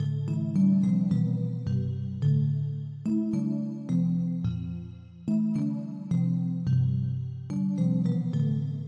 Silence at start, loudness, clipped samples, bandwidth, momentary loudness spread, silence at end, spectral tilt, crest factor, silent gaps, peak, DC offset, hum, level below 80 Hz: 0 s; -28 LUFS; under 0.1%; 7.8 kHz; 8 LU; 0 s; -10 dB/octave; 12 dB; none; -14 dBFS; under 0.1%; none; -60 dBFS